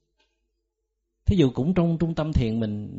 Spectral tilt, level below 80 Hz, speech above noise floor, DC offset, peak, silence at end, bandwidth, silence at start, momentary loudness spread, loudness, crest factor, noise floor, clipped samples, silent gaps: -8 dB/octave; -36 dBFS; 56 dB; under 0.1%; -8 dBFS; 0 s; 7.8 kHz; 1.25 s; 5 LU; -24 LUFS; 18 dB; -79 dBFS; under 0.1%; none